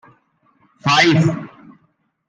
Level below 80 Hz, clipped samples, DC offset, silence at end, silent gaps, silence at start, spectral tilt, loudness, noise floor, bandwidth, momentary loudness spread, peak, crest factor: -62 dBFS; under 0.1%; under 0.1%; 0.8 s; none; 0.85 s; -5 dB/octave; -15 LUFS; -63 dBFS; 9.4 kHz; 18 LU; -2 dBFS; 18 dB